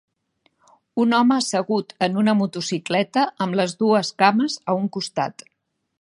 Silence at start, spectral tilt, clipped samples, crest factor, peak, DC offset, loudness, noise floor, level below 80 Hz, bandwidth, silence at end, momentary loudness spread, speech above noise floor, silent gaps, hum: 0.95 s; -5 dB/octave; under 0.1%; 20 dB; -2 dBFS; under 0.1%; -21 LUFS; -75 dBFS; -70 dBFS; 11.5 kHz; 0.7 s; 8 LU; 55 dB; none; none